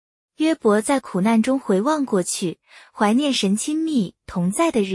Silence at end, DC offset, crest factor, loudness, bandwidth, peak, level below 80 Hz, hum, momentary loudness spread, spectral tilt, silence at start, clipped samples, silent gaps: 0 s; under 0.1%; 16 dB; -21 LUFS; 12 kHz; -6 dBFS; -58 dBFS; none; 7 LU; -5 dB/octave; 0.4 s; under 0.1%; none